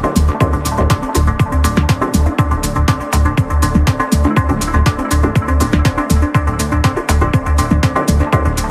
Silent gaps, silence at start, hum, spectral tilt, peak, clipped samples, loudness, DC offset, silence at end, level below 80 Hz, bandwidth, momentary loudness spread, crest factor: none; 0 s; none; -6 dB/octave; 0 dBFS; under 0.1%; -14 LUFS; under 0.1%; 0 s; -18 dBFS; 15 kHz; 2 LU; 12 dB